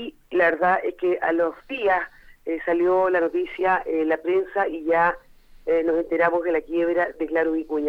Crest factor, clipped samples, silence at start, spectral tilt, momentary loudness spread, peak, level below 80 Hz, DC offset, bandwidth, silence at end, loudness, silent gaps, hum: 16 dB; under 0.1%; 0 s; -7 dB/octave; 6 LU; -6 dBFS; -54 dBFS; under 0.1%; 5.4 kHz; 0 s; -23 LUFS; none; none